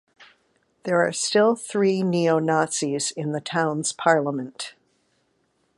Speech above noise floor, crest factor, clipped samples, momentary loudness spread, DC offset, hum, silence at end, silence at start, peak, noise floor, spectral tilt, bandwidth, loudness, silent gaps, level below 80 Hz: 46 dB; 20 dB; under 0.1%; 10 LU; under 0.1%; none; 1.05 s; 0.2 s; -4 dBFS; -69 dBFS; -4 dB/octave; 11.5 kHz; -22 LUFS; none; -72 dBFS